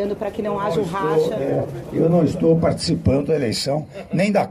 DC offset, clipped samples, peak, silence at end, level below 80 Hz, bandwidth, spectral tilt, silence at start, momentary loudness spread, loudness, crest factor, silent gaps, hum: under 0.1%; under 0.1%; -6 dBFS; 0 s; -44 dBFS; 14 kHz; -6.5 dB/octave; 0 s; 7 LU; -20 LUFS; 14 dB; none; none